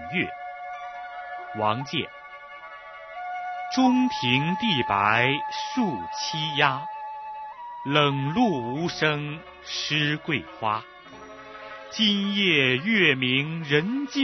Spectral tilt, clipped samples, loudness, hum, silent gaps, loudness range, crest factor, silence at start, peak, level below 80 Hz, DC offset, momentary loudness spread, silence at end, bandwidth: -2.5 dB/octave; under 0.1%; -24 LUFS; none; none; 5 LU; 22 dB; 0 s; -4 dBFS; -62 dBFS; under 0.1%; 19 LU; 0 s; 6.4 kHz